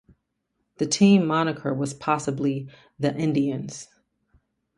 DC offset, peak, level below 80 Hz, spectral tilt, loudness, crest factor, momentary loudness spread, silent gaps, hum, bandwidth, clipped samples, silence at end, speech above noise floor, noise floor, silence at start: under 0.1%; -6 dBFS; -64 dBFS; -5.5 dB/octave; -24 LUFS; 20 dB; 16 LU; none; none; 11 kHz; under 0.1%; 0.95 s; 53 dB; -77 dBFS; 0.8 s